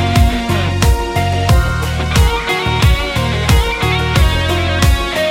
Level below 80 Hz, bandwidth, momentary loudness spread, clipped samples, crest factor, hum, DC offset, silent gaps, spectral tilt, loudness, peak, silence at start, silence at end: -18 dBFS; 16.5 kHz; 3 LU; under 0.1%; 12 dB; none; under 0.1%; none; -5 dB/octave; -14 LUFS; 0 dBFS; 0 s; 0 s